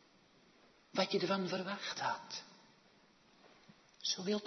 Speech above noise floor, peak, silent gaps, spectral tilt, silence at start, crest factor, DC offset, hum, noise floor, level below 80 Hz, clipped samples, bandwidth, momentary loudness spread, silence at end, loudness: 30 dB; -20 dBFS; none; -2.5 dB/octave; 0.95 s; 22 dB; under 0.1%; none; -67 dBFS; -88 dBFS; under 0.1%; 6.2 kHz; 12 LU; 0 s; -38 LUFS